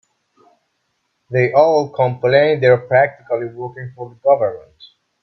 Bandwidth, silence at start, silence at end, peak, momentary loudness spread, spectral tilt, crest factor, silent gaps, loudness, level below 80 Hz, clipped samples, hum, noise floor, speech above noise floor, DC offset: 6 kHz; 1.3 s; 0.4 s; 0 dBFS; 17 LU; -7.5 dB/octave; 16 dB; none; -16 LUFS; -60 dBFS; under 0.1%; none; -69 dBFS; 54 dB; under 0.1%